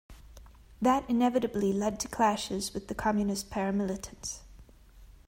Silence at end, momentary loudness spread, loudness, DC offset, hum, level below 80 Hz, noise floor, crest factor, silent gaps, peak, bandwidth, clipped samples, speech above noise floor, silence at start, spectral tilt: 0.15 s; 11 LU; -30 LUFS; under 0.1%; none; -52 dBFS; -54 dBFS; 18 dB; none; -12 dBFS; 16 kHz; under 0.1%; 24 dB; 0.1 s; -5 dB/octave